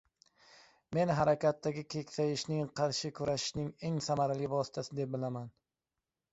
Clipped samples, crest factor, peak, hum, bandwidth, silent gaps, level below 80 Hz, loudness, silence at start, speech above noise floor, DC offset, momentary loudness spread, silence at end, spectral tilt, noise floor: under 0.1%; 18 dB; -16 dBFS; none; 8 kHz; none; -66 dBFS; -35 LUFS; 0.9 s; over 56 dB; under 0.1%; 9 LU; 0.85 s; -5.5 dB/octave; under -90 dBFS